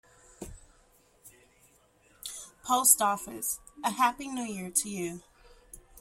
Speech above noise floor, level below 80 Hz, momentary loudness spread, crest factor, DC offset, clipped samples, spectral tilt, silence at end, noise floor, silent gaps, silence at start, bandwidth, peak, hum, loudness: 35 dB; -62 dBFS; 26 LU; 28 dB; under 0.1%; under 0.1%; -1.5 dB/octave; 0 s; -64 dBFS; none; 0.4 s; 16.5 kHz; -6 dBFS; none; -28 LUFS